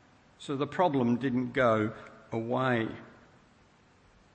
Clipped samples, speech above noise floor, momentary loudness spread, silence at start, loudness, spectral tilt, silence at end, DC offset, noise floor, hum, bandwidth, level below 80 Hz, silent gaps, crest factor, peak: under 0.1%; 33 dB; 14 LU; 0.4 s; -30 LUFS; -7.5 dB/octave; 1.25 s; under 0.1%; -62 dBFS; none; 8.8 kHz; -66 dBFS; none; 20 dB; -12 dBFS